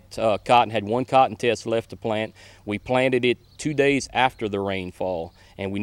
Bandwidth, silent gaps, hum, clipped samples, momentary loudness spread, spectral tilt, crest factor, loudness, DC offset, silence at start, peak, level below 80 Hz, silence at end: 15.5 kHz; none; none; under 0.1%; 13 LU; -5 dB/octave; 20 dB; -23 LUFS; under 0.1%; 0.1 s; -4 dBFS; -54 dBFS; 0 s